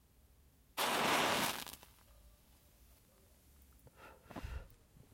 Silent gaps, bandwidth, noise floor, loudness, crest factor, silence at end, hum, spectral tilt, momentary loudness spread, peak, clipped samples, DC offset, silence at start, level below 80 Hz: none; 16.5 kHz; -67 dBFS; -36 LUFS; 24 dB; 0.4 s; none; -2 dB/octave; 26 LU; -20 dBFS; under 0.1%; under 0.1%; 0.75 s; -60 dBFS